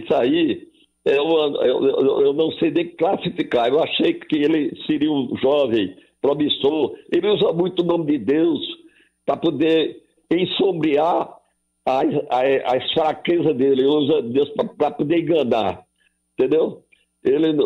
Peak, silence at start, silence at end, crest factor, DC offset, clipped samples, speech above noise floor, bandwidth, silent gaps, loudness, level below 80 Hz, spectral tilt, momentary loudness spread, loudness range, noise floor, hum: -8 dBFS; 0 s; 0 s; 12 dB; under 0.1%; under 0.1%; 47 dB; 6.4 kHz; none; -20 LUFS; -62 dBFS; -7.5 dB/octave; 6 LU; 2 LU; -66 dBFS; none